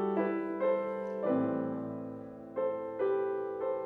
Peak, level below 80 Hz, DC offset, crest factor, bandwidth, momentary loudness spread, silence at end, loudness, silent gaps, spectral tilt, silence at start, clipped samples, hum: -18 dBFS; -74 dBFS; under 0.1%; 14 dB; 4.3 kHz; 10 LU; 0 s; -34 LUFS; none; -9.5 dB/octave; 0 s; under 0.1%; none